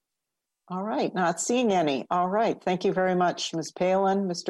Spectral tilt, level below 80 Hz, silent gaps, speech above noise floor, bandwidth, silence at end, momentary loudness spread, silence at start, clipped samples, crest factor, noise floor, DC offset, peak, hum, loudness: -4.5 dB/octave; -70 dBFS; none; 60 dB; 12.5 kHz; 0 s; 7 LU; 0.7 s; under 0.1%; 16 dB; -85 dBFS; under 0.1%; -10 dBFS; none; -26 LUFS